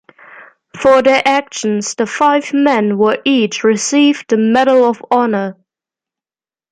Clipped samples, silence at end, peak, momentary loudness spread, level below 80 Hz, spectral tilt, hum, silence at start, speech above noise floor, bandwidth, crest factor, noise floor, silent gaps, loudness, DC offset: under 0.1%; 1.2 s; 0 dBFS; 7 LU; -58 dBFS; -4 dB/octave; none; 0.4 s; over 78 dB; 9.8 kHz; 12 dB; under -90 dBFS; none; -13 LUFS; under 0.1%